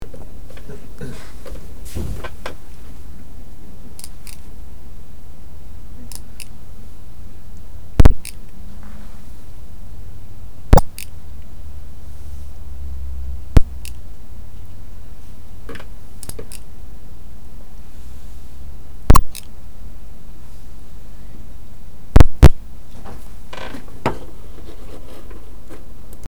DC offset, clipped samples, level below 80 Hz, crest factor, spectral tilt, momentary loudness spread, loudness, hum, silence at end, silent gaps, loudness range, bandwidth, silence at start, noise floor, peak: 10%; 1%; -24 dBFS; 18 dB; -6.5 dB/octave; 25 LU; -20 LUFS; none; 2.1 s; none; 19 LU; over 20 kHz; 0 s; -37 dBFS; 0 dBFS